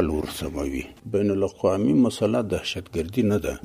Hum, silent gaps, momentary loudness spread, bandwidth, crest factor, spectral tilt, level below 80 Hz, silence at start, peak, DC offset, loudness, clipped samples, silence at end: none; none; 9 LU; 15.5 kHz; 18 dB; -6.5 dB/octave; -42 dBFS; 0 s; -6 dBFS; under 0.1%; -24 LUFS; under 0.1%; 0.05 s